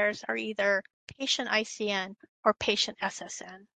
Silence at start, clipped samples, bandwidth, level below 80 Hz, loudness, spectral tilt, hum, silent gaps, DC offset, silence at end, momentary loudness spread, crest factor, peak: 0 s; under 0.1%; 9.4 kHz; -66 dBFS; -29 LUFS; -2 dB/octave; none; 0.93-1.07 s, 2.29-2.43 s; under 0.1%; 0.15 s; 12 LU; 24 dB; -8 dBFS